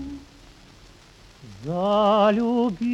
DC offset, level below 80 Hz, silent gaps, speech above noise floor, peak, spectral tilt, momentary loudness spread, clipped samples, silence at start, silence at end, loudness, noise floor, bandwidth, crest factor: under 0.1%; -52 dBFS; none; 30 dB; -8 dBFS; -7 dB/octave; 20 LU; under 0.1%; 0 s; 0 s; -21 LUFS; -50 dBFS; 10 kHz; 16 dB